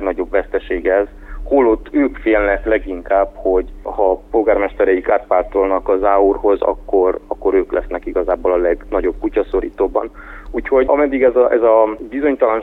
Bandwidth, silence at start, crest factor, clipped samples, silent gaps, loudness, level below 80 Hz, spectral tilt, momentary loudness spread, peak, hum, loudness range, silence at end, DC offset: 4 kHz; 0 s; 14 dB; under 0.1%; none; -16 LUFS; -34 dBFS; -8.5 dB/octave; 8 LU; -2 dBFS; none; 2 LU; 0 s; under 0.1%